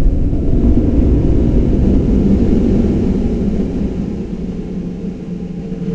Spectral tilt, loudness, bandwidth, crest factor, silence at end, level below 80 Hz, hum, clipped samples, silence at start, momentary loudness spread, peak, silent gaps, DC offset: -10 dB/octave; -16 LUFS; 7.2 kHz; 14 dB; 0 s; -18 dBFS; none; under 0.1%; 0 s; 11 LU; 0 dBFS; none; under 0.1%